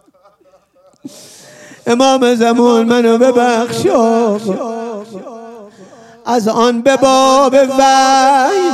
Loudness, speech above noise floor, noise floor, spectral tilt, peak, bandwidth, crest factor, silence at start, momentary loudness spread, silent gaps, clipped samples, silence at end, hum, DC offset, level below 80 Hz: -11 LUFS; 40 dB; -50 dBFS; -4 dB/octave; 0 dBFS; 13.5 kHz; 12 dB; 1.05 s; 16 LU; none; under 0.1%; 0 s; none; under 0.1%; -56 dBFS